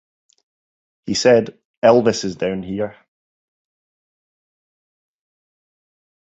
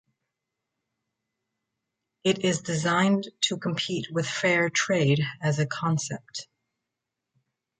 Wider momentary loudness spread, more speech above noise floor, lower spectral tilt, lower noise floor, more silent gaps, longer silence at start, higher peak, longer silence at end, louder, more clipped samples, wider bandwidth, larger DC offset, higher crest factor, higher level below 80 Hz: first, 14 LU vs 7 LU; first, over 74 dB vs 60 dB; about the same, -4.5 dB/octave vs -4.5 dB/octave; first, under -90 dBFS vs -85 dBFS; first, 1.65-1.82 s vs none; second, 1.05 s vs 2.25 s; first, -2 dBFS vs -10 dBFS; first, 3.45 s vs 1.35 s; first, -18 LUFS vs -26 LUFS; neither; second, 8.2 kHz vs 9.4 kHz; neither; about the same, 20 dB vs 20 dB; first, -56 dBFS vs -68 dBFS